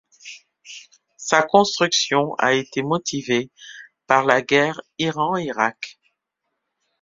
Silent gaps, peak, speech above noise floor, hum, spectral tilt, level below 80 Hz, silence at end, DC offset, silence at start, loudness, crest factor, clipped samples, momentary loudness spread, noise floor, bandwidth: none; 0 dBFS; 58 dB; none; -3.5 dB/octave; -64 dBFS; 1.1 s; under 0.1%; 0.25 s; -20 LUFS; 22 dB; under 0.1%; 22 LU; -78 dBFS; 7.8 kHz